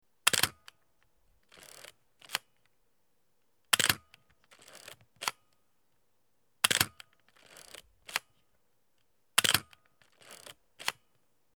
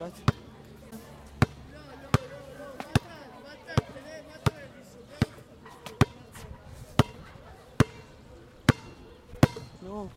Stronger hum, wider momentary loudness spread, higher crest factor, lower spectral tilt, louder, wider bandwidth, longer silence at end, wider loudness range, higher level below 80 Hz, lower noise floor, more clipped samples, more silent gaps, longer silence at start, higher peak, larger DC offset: neither; first, 25 LU vs 22 LU; first, 36 dB vs 30 dB; second, 0 dB/octave vs -6 dB/octave; about the same, -30 LUFS vs -30 LUFS; first, over 20 kHz vs 16 kHz; first, 0.65 s vs 0.05 s; about the same, 2 LU vs 4 LU; second, -72 dBFS vs -46 dBFS; first, -78 dBFS vs -50 dBFS; neither; neither; first, 0.25 s vs 0 s; about the same, 0 dBFS vs 0 dBFS; neither